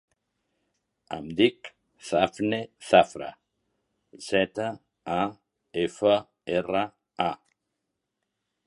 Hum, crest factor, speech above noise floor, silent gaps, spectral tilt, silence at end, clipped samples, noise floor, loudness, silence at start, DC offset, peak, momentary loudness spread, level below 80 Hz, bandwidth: none; 24 dB; 57 dB; none; -5 dB/octave; 1.3 s; under 0.1%; -82 dBFS; -26 LUFS; 1.1 s; under 0.1%; -4 dBFS; 19 LU; -62 dBFS; 11.5 kHz